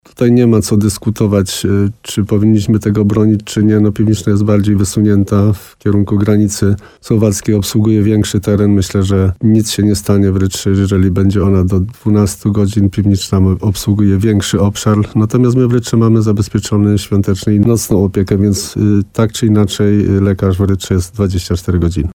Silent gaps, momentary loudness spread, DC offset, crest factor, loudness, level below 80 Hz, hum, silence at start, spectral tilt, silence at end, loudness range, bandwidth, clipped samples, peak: none; 4 LU; under 0.1%; 12 dB; -12 LUFS; -34 dBFS; none; 0.2 s; -6.5 dB/octave; 0 s; 1 LU; 17 kHz; under 0.1%; 0 dBFS